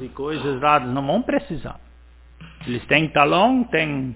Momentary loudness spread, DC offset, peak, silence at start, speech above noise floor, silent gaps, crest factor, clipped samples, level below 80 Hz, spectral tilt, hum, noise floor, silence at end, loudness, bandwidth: 16 LU; under 0.1%; 0 dBFS; 0 s; 27 dB; none; 20 dB; under 0.1%; -46 dBFS; -9.5 dB/octave; none; -47 dBFS; 0 s; -20 LUFS; 4 kHz